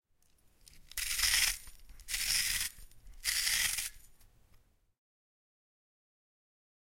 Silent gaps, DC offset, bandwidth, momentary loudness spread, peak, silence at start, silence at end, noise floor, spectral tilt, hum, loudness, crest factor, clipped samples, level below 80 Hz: none; under 0.1%; 16.5 kHz; 12 LU; -14 dBFS; 0.75 s; 2.85 s; -68 dBFS; 2.5 dB/octave; none; -32 LUFS; 26 dB; under 0.1%; -54 dBFS